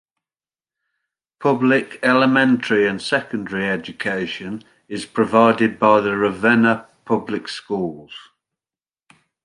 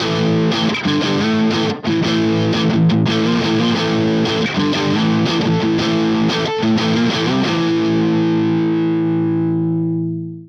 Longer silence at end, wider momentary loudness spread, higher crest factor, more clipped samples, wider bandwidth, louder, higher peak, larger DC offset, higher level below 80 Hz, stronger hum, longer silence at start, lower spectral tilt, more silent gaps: first, 1.2 s vs 0 s; first, 14 LU vs 2 LU; first, 18 dB vs 10 dB; neither; first, 11 kHz vs 8 kHz; about the same, -18 LUFS vs -16 LUFS; first, -2 dBFS vs -6 dBFS; neither; second, -60 dBFS vs -52 dBFS; neither; first, 1.4 s vs 0 s; about the same, -6 dB/octave vs -6 dB/octave; neither